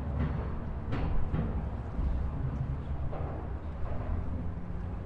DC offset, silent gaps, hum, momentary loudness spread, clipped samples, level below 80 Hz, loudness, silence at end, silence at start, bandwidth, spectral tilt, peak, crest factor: under 0.1%; none; none; 5 LU; under 0.1%; -36 dBFS; -36 LUFS; 0 s; 0 s; 5 kHz; -10 dB/octave; -18 dBFS; 14 dB